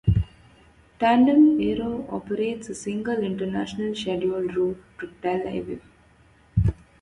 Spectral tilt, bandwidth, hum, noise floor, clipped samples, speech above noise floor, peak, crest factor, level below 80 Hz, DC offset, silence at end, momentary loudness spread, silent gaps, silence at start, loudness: -7.5 dB/octave; 11 kHz; none; -56 dBFS; under 0.1%; 33 dB; -6 dBFS; 18 dB; -40 dBFS; under 0.1%; 0.3 s; 15 LU; none; 0.05 s; -24 LUFS